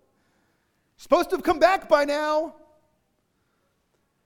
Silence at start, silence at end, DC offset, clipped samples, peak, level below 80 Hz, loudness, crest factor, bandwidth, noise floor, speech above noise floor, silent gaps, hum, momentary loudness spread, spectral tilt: 1 s; 1.75 s; under 0.1%; under 0.1%; -4 dBFS; -56 dBFS; -22 LUFS; 22 dB; 18 kHz; -71 dBFS; 50 dB; none; none; 7 LU; -3.5 dB/octave